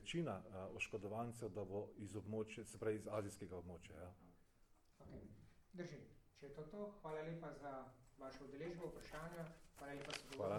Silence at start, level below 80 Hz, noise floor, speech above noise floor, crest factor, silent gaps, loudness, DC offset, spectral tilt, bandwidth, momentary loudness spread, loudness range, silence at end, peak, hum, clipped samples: 0 s; -70 dBFS; -73 dBFS; 23 dB; 20 dB; none; -51 LUFS; under 0.1%; -5.5 dB/octave; 19 kHz; 14 LU; 9 LU; 0 s; -30 dBFS; none; under 0.1%